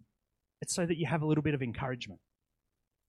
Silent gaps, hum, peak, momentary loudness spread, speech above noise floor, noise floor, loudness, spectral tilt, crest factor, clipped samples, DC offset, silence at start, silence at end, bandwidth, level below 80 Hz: none; none; -16 dBFS; 12 LU; 52 dB; -85 dBFS; -33 LUFS; -5.5 dB/octave; 18 dB; under 0.1%; under 0.1%; 0.6 s; 0.95 s; 12.5 kHz; -62 dBFS